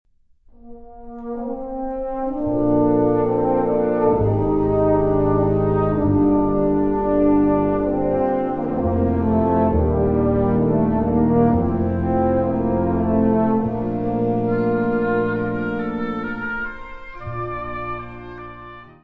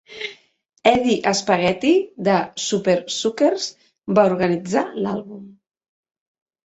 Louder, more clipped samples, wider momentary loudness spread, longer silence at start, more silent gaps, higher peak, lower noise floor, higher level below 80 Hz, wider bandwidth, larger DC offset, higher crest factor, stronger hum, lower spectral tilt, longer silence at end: about the same, -20 LUFS vs -20 LUFS; neither; about the same, 12 LU vs 14 LU; first, 0.65 s vs 0.1 s; neither; second, -6 dBFS vs -2 dBFS; first, -52 dBFS vs -39 dBFS; first, -36 dBFS vs -58 dBFS; second, 4.5 kHz vs 8.2 kHz; neither; about the same, 14 dB vs 18 dB; neither; first, -11.5 dB/octave vs -4.5 dB/octave; second, 0.15 s vs 1.15 s